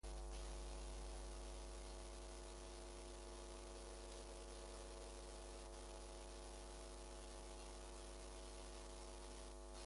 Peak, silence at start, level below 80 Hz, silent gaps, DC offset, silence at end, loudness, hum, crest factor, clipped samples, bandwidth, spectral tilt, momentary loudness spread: -42 dBFS; 0.05 s; -56 dBFS; none; under 0.1%; 0 s; -55 LUFS; 60 Hz at -80 dBFS; 12 dB; under 0.1%; 11.5 kHz; -4 dB/octave; 2 LU